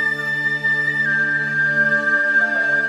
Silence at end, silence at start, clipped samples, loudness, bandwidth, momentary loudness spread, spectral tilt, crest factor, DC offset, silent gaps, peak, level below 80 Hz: 0 s; 0 s; under 0.1%; -17 LUFS; 13 kHz; 3 LU; -4.5 dB/octave; 10 dB; under 0.1%; none; -8 dBFS; -66 dBFS